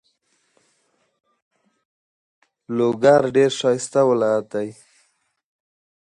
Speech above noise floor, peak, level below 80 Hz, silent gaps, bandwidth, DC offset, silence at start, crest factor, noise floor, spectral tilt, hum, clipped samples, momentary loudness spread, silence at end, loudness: 49 dB; -2 dBFS; -68 dBFS; none; 11 kHz; under 0.1%; 2.7 s; 20 dB; -67 dBFS; -5 dB/octave; none; under 0.1%; 13 LU; 1.4 s; -19 LUFS